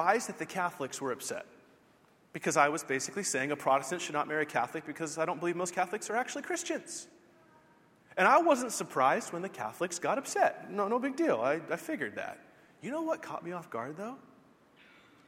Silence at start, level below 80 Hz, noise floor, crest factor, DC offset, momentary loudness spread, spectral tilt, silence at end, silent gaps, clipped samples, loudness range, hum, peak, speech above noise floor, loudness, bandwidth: 0 s; -80 dBFS; -64 dBFS; 24 dB; under 0.1%; 13 LU; -3.5 dB/octave; 1.1 s; none; under 0.1%; 6 LU; none; -10 dBFS; 32 dB; -32 LUFS; 16 kHz